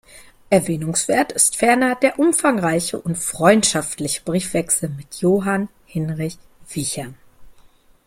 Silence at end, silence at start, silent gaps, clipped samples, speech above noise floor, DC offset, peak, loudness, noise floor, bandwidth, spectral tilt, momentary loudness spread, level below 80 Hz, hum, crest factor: 0.55 s; 0.15 s; none; under 0.1%; 31 dB; under 0.1%; -2 dBFS; -19 LUFS; -50 dBFS; 16.5 kHz; -4 dB/octave; 12 LU; -52 dBFS; none; 18 dB